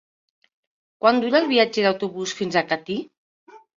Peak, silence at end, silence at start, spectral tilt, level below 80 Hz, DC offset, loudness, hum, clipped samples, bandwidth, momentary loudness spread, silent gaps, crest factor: -2 dBFS; 0.2 s; 1.05 s; -4 dB/octave; -68 dBFS; under 0.1%; -21 LUFS; none; under 0.1%; 7.6 kHz; 10 LU; 3.17-3.47 s; 20 dB